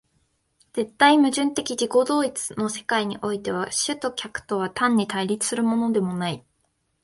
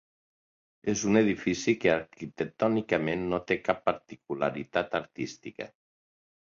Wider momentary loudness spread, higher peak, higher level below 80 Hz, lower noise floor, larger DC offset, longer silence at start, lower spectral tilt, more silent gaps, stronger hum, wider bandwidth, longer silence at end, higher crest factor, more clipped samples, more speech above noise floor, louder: second, 10 LU vs 14 LU; first, -2 dBFS vs -8 dBFS; about the same, -62 dBFS vs -62 dBFS; second, -71 dBFS vs under -90 dBFS; neither; about the same, 0.75 s vs 0.85 s; second, -3.5 dB/octave vs -5 dB/octave; neither; neither; first, 11.5 kHz vs 7.6 kHz; second, 0.65 s vs 0.9 s; about the same, 22 dB vs 22 dB; neither; second, 48 dB vs over 61 dB; first, -23 LUFS vs -29 LUFS